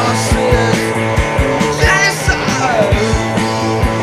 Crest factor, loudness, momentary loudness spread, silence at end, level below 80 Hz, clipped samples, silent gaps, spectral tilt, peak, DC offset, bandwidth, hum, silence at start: 12 dB; -13 LUFS; 4 LU; 0 s; -22 dBFS; under 0.1%; none; -4.5 dB/octave; 0 dBFS; under 0.1%; 16 kHz; none; 0 s